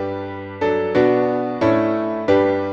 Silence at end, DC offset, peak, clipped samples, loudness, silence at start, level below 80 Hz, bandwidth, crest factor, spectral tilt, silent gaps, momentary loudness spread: 0 s; under 0.1%; -2 dBFS; under 0.1%; -19 LUFS; 0 s; -54 dBFS; 7.2 kHz; 16 dB; -8 dB/octave; none; 9 LU